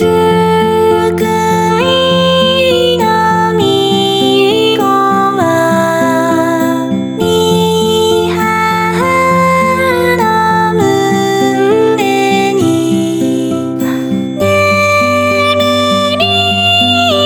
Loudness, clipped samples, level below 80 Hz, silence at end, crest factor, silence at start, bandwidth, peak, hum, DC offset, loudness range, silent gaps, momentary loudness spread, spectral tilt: -10 LUFS; under 0.1%; -44 dBFS; 0 s; 10 dB; 0 s; 20 kHz; 0 dBFS; none; under 0.1%; 2 LU; none; 4 LU; -5 dB/octave